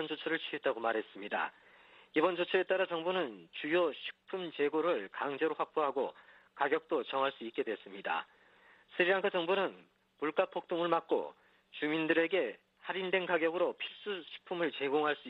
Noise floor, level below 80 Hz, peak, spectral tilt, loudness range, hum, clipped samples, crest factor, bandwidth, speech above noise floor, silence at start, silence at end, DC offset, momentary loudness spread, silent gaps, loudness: -63 dBFS; -84 dBFS; -14 dBFS; -6.5 dB/octave; 2 LU; none; under 0.1%; 20 dB; 5.4 kHz; 29 dB; 0 s; 0 s; under 0.1%; 10 LU; none; -34 LUFS